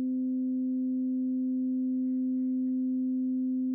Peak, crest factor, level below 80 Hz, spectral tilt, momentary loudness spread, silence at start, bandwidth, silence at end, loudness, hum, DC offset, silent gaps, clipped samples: -26 dBFS; 4 dB; under -90 dBFS; -12.5 dB/octave; 1 LU; 0 s; 0.6 kHz; 0 s; -30 LUFS; none; under 0.1%; none; under 0.1%